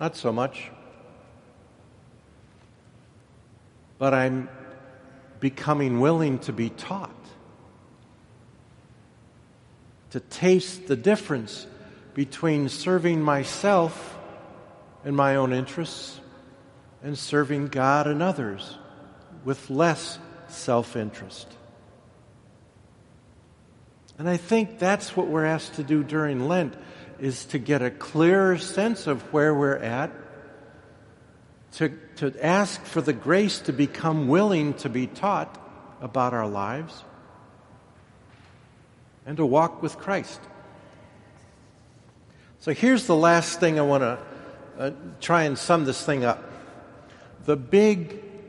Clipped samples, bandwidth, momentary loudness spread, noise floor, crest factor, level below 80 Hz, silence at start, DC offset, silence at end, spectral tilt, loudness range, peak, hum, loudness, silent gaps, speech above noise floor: under 0.1%; 11.5 kHz; 20 LU; -54 dBFS; 22 dB; -64 dBFS; 0 s; under 0.1%; 0 s; -6 dB/octave; 9 LU; -4 dBFS; none; -24 LUFS; none; 30 dB